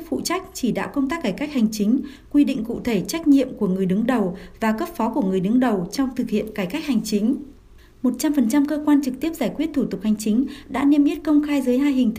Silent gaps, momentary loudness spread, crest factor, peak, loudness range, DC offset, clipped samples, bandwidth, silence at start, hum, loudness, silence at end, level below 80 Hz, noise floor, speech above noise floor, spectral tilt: none; 6 LU; 14 dB; -6 dBFS; 2 LU; under 0.1%; under 0.1%; 15.5 kHz; 0 s; none; -21 LUFS; 0 s; -48 dBFS; -47 dBFS; 27 dB; -6 dB/octave